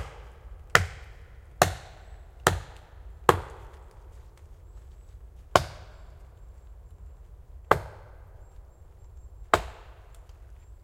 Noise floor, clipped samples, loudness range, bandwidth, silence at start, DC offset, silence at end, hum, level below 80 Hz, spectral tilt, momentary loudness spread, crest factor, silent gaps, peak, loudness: -50 dBFS; under 0.1%; 7 LU; 16.5 kHz; 0 s; under 0.1%; 0.1 s; none; -46 dBFS; -3.5 dB/octave; 26 LU; 32 dB; none; 0 dBFS; -27 LUFS